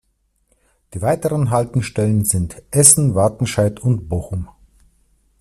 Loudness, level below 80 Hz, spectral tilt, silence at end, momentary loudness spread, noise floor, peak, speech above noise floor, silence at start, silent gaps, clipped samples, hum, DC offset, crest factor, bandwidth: -16 LUFS; -44 dBFS; -5 dB/octave; 0.95 s; 15 LU; -65 dBFS; 0 dBFS; 48 dB; 0.95 s; none; under 0.1%; none; under 0.1%; 18 dB; 16 kHz